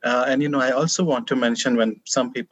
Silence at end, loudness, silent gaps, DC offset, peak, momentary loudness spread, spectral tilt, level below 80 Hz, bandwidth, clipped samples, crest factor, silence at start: 0.05 s; -21 LUFS; none; under 0.1%; -6 dBFS; 3 LU; -4 dB/octave; -72 dBFS; 8.8 kHz; under 0.1%; 16 dB; 0 s